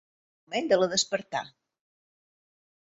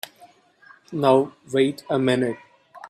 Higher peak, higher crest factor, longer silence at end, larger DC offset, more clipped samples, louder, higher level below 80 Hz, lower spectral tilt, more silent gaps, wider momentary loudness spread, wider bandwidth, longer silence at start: second, -12 dBFS vs -4 dBFS; about the same, 20 dB vs 20 dB; first, 1.5 s vs 0.05 s; neither; neither; second, -27 LUFS vs -22 LUFS; second, -74 dBFS vs -66 dBFS; second, -2.5 dB/octave vs -6 dB/octave; neither; second, 11 LU vs 16 LU; second, 8 kHz vs 14 kHz; second, 0.5 s vs 0.9 s